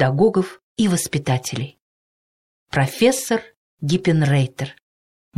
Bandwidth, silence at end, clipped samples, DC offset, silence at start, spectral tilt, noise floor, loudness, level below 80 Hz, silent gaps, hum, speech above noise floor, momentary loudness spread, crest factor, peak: 15.5 kHz; 0.65 s; under 0.1%; under 0.1%; 0 s; -5.5 dB/octave; under -90 dBFS; -20 LUFS; -54 dBFS; 0.63-0.76 s, 1.80-2.67 s, 3.57-3.78 s; none; over 71 dB; 12 LU; 16 dB; -4 dBFS